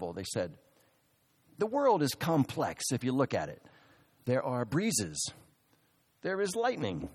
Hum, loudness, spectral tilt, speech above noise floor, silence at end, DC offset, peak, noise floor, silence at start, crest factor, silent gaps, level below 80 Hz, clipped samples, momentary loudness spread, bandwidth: none; -32 LUFS; -4.5 dB/octave; 39 dB; 0 s; under 0.1%; -14 dBFS; -71 dBFS; 0 s; 20 dB; none; -64 dBFS; under 0.1%; 9 LU; 15.5 kHz